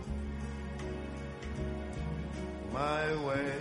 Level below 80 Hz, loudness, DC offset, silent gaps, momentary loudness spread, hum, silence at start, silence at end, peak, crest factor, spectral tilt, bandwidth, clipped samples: -44 dBFS; -37 LUFS; under 0.1%; none; 8 LU; none; 0 s; 0 s; -18 dBFS; 18 dB; -6.5 dB/octave; 11.5 kHz; under 0.1%